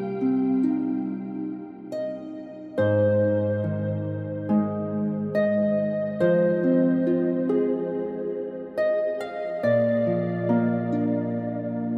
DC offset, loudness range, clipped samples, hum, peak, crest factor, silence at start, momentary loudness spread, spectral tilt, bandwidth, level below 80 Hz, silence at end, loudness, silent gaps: under 0.1%; 3 LU; under 0.1%; none; -10 dBFS; 14 dB; 0 s; 11 LU; -10 dB/octave; 5.2 kHz; -68 dBFS; 0 s; -25 LUFS; none